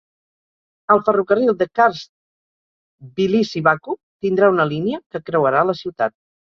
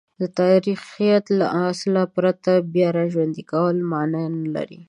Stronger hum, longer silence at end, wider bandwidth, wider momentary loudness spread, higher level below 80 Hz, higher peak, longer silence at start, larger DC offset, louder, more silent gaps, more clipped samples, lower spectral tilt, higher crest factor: neither; first, 0.4 s vs 0.05 s; second, 6.8 kHz vs 11 kHz; first, 10 LU vs 7 LU; first, -62 dBFS vs -68 dBFS; about the same, -2 dBFS vs -4 dBFS; first, 0.9 s vs 0.2 s; neither; first, -18 LUFS vs -21 LUFS; first, 2.09-2.99 s, 4.03-4.20 s, 5.06-5.10 s vs none; neither; about the same, -7 dB/octave vs -7.5 dB/octave; about the same, 18 dB vs 16 dB